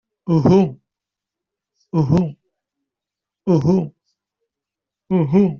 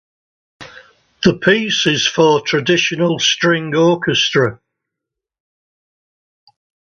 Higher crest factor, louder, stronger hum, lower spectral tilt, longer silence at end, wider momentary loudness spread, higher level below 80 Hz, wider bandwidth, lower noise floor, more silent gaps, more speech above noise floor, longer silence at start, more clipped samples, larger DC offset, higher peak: about the same, 18 dB vs 18 dB; second, -18 LUFS vs -14 LUFS; neither; first, -9.5 dB/octave vs -4 dB/octave; second, 0 s vs 2.3 s; first, 11 LU vs 4 LU; about the same, -50 dBFS vs -54 dBFS; about the same, 6.8 kHz vs 7.4 kHz; first, -86 dBFS vs -82 dBFS; neither; first, 71 dB vs 67 dB; second, 0.25 s vs 0.6 s; neither; neither; about the same, -2 dBFS vs 0 dBFS